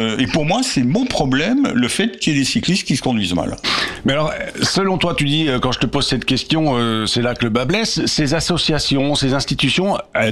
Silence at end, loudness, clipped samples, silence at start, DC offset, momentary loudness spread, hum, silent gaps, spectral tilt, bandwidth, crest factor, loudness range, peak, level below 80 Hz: 0 s; -17 LUFS; under 0.1%; 0 s; under 0.1%; 2 LU; none; none; -4.5 dB/octave; 14 kHz; 12 dB; 1 LU; -4 dBFS; -38 dBFS